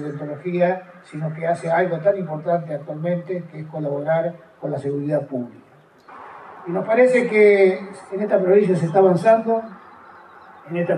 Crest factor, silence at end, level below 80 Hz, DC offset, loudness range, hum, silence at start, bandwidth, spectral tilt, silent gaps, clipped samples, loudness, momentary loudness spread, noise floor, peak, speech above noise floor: 16 dB; 0 s; -74 dBFS; under 0.1%; 9 LU; none; 0 s; 11 kHz; -8 dB/octave; none; under 0.1%; -20 LUFS; 16 LU; -48 dBFS; -4 dBFS; 28 dB